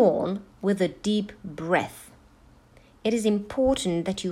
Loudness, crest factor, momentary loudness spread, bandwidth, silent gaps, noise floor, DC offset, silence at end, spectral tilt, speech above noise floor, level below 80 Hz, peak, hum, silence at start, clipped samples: -26 LUFS; 18 dB; 11 LU; 15 kHz; none; -55 dBFS; under 0.1%; 0 s; -5.5 dB/octave; 30 dB; -52 dBFS; -8 dBFS; none; 0 s; under 0.1%